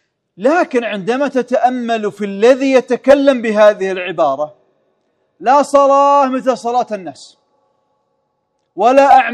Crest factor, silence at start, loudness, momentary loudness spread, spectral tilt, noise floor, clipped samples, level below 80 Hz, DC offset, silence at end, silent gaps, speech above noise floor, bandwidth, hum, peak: 14 dB; 0.4 s; -13 LUFS; 11 LU; -5 dB/octave; -67 dBFS; 0.3%; -58 dBFS; under 0.1%; 0 s; none; 54 dB; 10.5 kHz; none; 0 dBFS